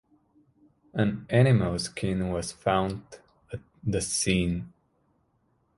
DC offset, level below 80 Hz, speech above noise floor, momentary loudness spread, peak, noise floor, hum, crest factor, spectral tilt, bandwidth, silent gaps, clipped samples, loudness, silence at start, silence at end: under 0.1%; -48 dBFS; 44 dB; 18 LU; -8 dBFS; -70 dBFS; none; 22 dB; -5.5 dB/octave; 11.5 kHz; none; under 0.1%; -27 LUFS; 0.95 s; 1.1 s